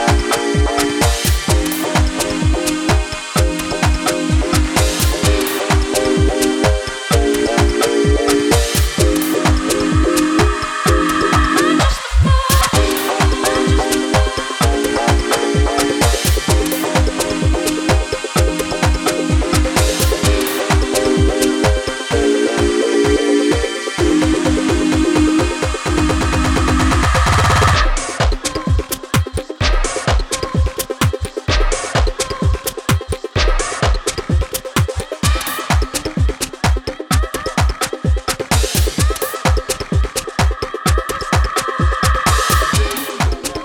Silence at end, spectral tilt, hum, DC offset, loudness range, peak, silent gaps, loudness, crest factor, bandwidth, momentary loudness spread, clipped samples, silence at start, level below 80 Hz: 0 s; -4.5 dB/octave; none; under 0.1%; 4 LU; 0 dBFS; none; -16 LUFS; 14 dB; 18 kHz; 5 LU; under 0.1%; 0 s; -20 dBFS